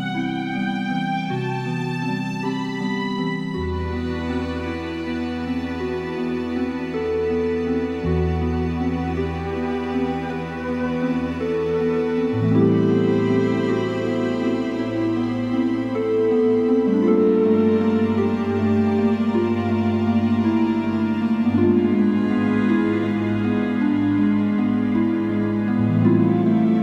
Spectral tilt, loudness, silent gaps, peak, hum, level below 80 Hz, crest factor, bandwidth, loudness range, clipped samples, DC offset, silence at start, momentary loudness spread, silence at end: -8.5 dB/octave; -21 LUFS; none; -4 dBFS; none; -42 dBFS; 16 dB; 7.8 kHz; 6 LU; under 0.1%; under 0.1%; 0 s; 8 LU; 0 s